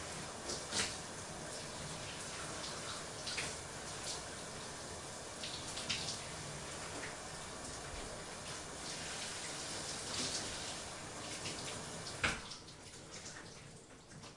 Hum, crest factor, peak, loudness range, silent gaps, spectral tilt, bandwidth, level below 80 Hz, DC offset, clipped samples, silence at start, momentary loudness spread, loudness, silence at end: none; 26 dB; -18 dBFS; 2 LU; none; -2 dB/octave; 12 kHz; -62 dBFS; under 0.1%; under 0.1%; 0 s; 11 LU; -43 LUFS; 0 s